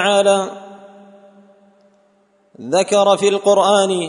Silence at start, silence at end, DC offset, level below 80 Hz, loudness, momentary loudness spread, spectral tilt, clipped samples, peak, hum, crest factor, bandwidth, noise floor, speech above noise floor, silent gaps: 0 s; 0 s; under 0.1%; -70 dBFS; -15 LUFS; 16 LU; -3.5 dB/octave; under 0.1%; -2 dBFS; none; 16 dB; 11 kHz; -57 dBFS; 43 dB; none